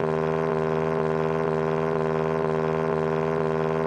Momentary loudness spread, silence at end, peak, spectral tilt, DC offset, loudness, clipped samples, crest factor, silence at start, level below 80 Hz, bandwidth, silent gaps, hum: 0 LU; 0 s; -10 dBFS; -8 dB/octave; under 0.1%; -25 LUFS; under 0.1%; 16 dB; 0 s; -52 dBFS; 8.8 kHz; none; none